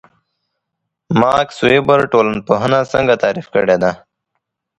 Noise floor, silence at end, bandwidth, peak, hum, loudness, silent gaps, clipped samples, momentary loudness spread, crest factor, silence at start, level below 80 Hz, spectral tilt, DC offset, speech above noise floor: -76 dBFS; 0.8 s; 10.5 kHz; 0 dBFS; none; -14 LUFS; none; under 0.1%; 5 LU; 16 dB; 1.1 s; -48 dBFS; -6 dB/octave; under 0.1%; 63 dB